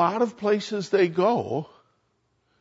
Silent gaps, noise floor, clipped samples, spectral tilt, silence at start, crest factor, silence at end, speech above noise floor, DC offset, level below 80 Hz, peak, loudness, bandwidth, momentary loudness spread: none; -71 dBFS; under 0.1%; -6 dB/octave; 0 s; 16 dB; 0.95 s; 47 dB; under 0.1%; -74 dBFS; -8 dBFS; -24 LUFS; 8 kHz; 10 LU